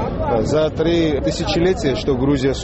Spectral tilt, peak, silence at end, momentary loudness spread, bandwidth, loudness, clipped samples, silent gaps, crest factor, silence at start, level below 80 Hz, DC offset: -6 dB/octave; -6 dBFS; 0 s; 2 LU; 8.2 kHz; -18 LUFS; under 0.1%; none; 12 dB; 0 s; -30 dBFS; under 0.1%